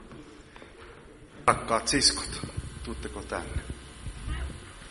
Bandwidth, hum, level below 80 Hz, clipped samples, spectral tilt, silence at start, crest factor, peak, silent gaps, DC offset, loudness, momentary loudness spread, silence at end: 11.5 kHz; none; -42 dBFS; under 0.1%; -2.5 dB/octave; 0 s; 28 dB; -4 dBFS; none; under 0.1%; -29 LUFS; 26 LU; 0 s